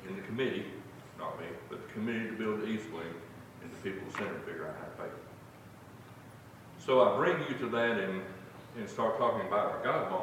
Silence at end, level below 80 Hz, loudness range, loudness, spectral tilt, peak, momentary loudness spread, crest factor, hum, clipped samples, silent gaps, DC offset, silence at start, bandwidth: 0 s; -70 dBFS; 11 LU; -34 LUFS; -6 dB/octave; -12 dBFS; 22 LU; 22 dB; none; under 0.1%; none; under 0.1%; 0 s; 16.5 kHz